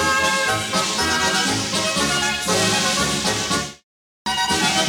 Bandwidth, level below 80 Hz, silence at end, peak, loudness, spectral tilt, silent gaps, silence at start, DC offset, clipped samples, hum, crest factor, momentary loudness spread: over 20 kHz; -46 dBFS; 0 s; -6 dBFS; -19 LUFS; -2 dB/octave; 3.84-4.25 s; 0 s; under 0.1%; under 0.1%; none; 14 dB; 5 LU